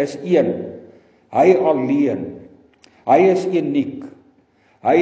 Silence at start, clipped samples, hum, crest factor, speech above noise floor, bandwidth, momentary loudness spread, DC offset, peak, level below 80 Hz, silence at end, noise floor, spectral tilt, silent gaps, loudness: 0 s; under 0.1%; none; 18 dB; 40 dB; 8 kHz; 16 LU; under 0.1%; 0 dBFS; -62 dBFS; 0 s; -57 dBFS; -7.5 dB/octave; none; -17 LUFS